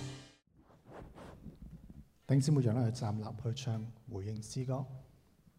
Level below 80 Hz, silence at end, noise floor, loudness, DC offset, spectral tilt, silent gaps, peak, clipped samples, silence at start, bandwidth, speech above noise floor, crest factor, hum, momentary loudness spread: -62 dBFS; 0.55 s; -65 dBFS; -36 LUFS; under 0.1%; -7 dB/octave; none; -18 dBFS; under 0.1%; 0 s; 12 kHz; 31 dB; 20 dB; none; 24 LU